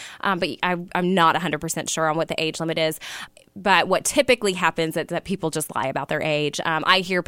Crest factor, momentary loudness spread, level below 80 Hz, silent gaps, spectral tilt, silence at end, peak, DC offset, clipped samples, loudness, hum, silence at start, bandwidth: 22 dB; 8 LU; -56 dBFS; none; -3.5 dB/octave; 0.05 s; 0 dBFS; under 0.1%; under 0.1%; -22 LUFS; none; 0 s; 16.5 kHz